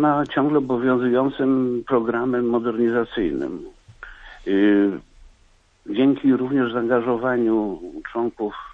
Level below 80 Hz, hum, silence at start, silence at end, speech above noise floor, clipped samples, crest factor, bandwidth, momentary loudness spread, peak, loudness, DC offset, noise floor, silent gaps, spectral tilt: -50 dBFS; none; 0 s; 0 s; 36 dB; under 0.1%; 14 dB; 4.2 kHz; 12 LU; -6 dBFS; -21 LUFS; under 0.1%; -57 dBFS; none; -8.5 dB/octave